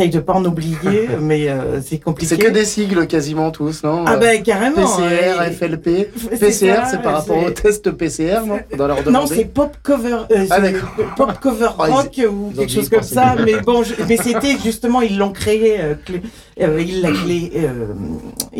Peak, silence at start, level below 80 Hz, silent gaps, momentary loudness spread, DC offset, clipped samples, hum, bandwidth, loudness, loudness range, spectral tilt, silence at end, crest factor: -4 dBFS; 0 s; -38 dBFS; none; 8 LU; under 0.1%; under 0.1%; none; 17 kHz; -16 LUFS; 2 LU; -5 dB/octave; 0 s; 12 dB